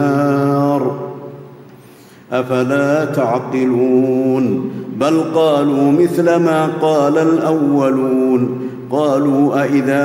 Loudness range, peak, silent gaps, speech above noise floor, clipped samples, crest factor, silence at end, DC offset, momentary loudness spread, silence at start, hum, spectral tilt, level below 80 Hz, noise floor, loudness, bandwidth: 4 LU; -2 dBFS; none; 27 dB; under 0.1%; 12 dB; 0 s; under 0.1%; 8 LU; 0 s; none; -7.5 dB/octave; -62 dBFS; -41 dBFS; -15 LUFS; 16 kHz